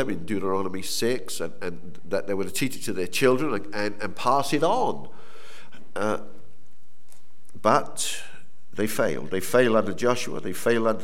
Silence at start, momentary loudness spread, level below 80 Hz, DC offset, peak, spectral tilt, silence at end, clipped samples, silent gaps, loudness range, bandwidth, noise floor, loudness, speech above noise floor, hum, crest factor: 0 s; 12 LU; -64 dBFS; 5%; -6 dBFS; -4 dB/octave; 0 s; under 0.1%; none; 4 LU; 17 kHz; -63 dBFS; -26 LUFS; 37 dB; none; 22 dB